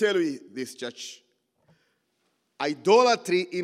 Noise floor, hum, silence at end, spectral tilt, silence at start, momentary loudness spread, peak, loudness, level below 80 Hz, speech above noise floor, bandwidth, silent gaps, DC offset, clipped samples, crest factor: -73 dBFS; none; 0 s; -4 dB/octave; 0 s; 17 LU; -6 dBFS; -25 LUFS; under -90 dBFS; 49 dB; 14 kHz; none; under 0.1%; under 0.1%; 20 dB